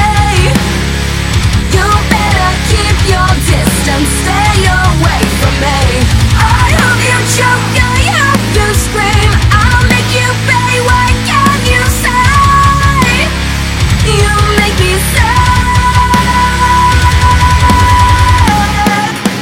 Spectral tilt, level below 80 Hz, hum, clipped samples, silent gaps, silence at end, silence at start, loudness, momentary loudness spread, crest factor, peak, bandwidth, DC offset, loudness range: -4.5 dB/octave; -14 dBFS; none; 0.4%; none; 0 s; 0 s; -9 LUFS; 3 LU; 8 dB; 0 dBFS; 17 kHz; under 0.1%; 2 LU